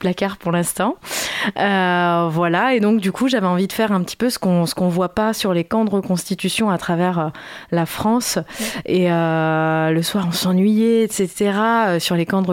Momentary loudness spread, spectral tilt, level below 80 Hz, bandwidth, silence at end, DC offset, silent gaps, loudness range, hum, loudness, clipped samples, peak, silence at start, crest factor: 6 LU; -5 dB/octave; -54 dBFS; 17 kHz; 0 s; under 0.1%; none; 3 LU; none; -18 LUFS; under 0.1%; -4 dBFS; 0 s; 14 dB